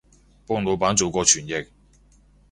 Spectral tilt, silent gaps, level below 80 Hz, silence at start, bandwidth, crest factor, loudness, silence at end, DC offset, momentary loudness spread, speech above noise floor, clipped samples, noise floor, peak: -2.5 dB/octave; none; -50 dBFS; 0.5 s; 11.5 kHz; 22 dB; -21 LUFS; 0.85 s; under 0.1%; 12 LU; 33 dB; under 0.1%; -55 dBFS; -2 dBFS